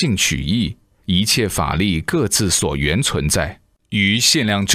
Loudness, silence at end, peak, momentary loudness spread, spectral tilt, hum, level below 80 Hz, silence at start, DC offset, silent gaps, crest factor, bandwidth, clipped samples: -17 LUFS; 0 s; 0 dBFS; 7 LU; -3.5 dB/octave; none; -34 dBFS; 0 s; under 0.1%; none; 18 dB; 16 kHz; under 0.1%